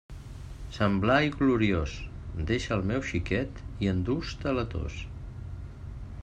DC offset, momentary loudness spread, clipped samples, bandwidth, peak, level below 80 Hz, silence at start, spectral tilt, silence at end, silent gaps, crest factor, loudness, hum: under 0.1%; 18 LU; under 0.1%; 9.8 kHz; -10 dBFS; -42 dBFS; 0.1 s; -6.5 dB/octave; 0 s; none; 20 dB; -29 LUFS; none